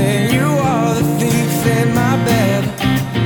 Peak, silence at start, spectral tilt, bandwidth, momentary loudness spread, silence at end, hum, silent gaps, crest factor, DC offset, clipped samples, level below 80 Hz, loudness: -2 dBFS; 0 s; -6 dB/octave; over 20 kHz; 2 LU; 0 s; none; none; 12 dB; under 0.1%; under 0.1%; -38 dBFS; -15 LUFS